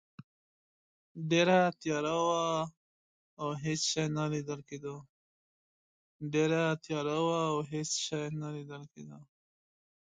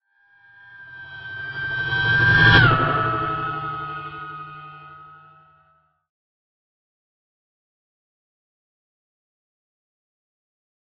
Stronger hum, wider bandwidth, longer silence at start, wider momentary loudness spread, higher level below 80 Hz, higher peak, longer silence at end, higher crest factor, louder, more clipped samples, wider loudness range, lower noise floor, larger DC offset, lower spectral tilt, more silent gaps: neither; first, 9.6 kHz vs 6 kHz; first, 1.15 s vs 0.7 s; second, 17 LU vs 25 LU; second, -72 dBFS vs -44 dBFS; second, -14 dBFS vs -2 dBFS; second, 0.85 s vs 5.85 s; about the same, 22 dB vs 22 dB; second, -32 LUFS vs -18 LUFS; neither; second, 5 LU vs 18 LU; first, under -90 dBFS vs -62 dBFS; neither; second, -4.5 dB/octave vs -7 dB/octave; first, 2.77-3.37 s, 5.09-6.20 s vs none